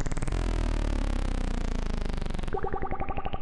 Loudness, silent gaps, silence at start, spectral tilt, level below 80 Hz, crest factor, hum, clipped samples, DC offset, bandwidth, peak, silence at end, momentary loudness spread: -33 LUFS; none; 0 s; -6 dB/octave; -30 dBFS; 12 dB; none; under 0.1%; under 0.1%; 11 kHz; -16 dBFS; 0 s; 3 LU